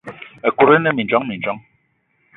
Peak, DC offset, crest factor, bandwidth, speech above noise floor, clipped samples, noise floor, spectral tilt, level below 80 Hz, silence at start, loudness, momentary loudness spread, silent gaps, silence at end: 0 dBFS; under 0.1%; 18 dB; 4 kHz; 48 dB; under 0.1%; -64 dBFS; -8.5 dB/octave; -58 dBFS; 0.05 s; -17 LUFS; 16 LU; none; 0.8 s